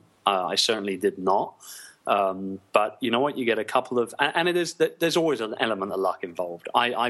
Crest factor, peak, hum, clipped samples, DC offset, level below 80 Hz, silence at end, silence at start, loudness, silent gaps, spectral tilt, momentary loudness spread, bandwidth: 24 dB; -2 dBFS; none; under 0.1%; under 0.1%; -74 dBFS; 0 s; 0.25 s; -25 LUFS; none; -3.5 dB/octave; 9 LU; 13 kHz